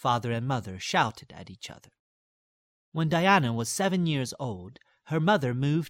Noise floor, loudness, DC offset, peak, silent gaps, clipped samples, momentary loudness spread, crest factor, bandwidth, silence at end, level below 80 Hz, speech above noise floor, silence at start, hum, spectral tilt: under -90 dBFS; -27 LUFS; under 0.1%; -8 dBFS; 1.99-2.92 s; under 0.1%; 19 LU; 20 dB; 16 kHz; 0 s; -64 dBFS; over 63 dB; 0.05 s; none; -5 dB/octave